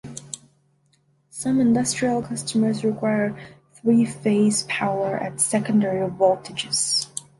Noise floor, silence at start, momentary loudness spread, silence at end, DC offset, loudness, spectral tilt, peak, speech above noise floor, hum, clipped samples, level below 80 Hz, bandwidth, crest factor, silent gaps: -64 dBFS; 0.05 s; 10 LU; 0.2 s; under 0.1%; -22 LUFS; -4 dB/octave; -6 dBFS; 42 dB; none; under 0.1%; -62 dBFS; 11.5 kHz; 18 dB; none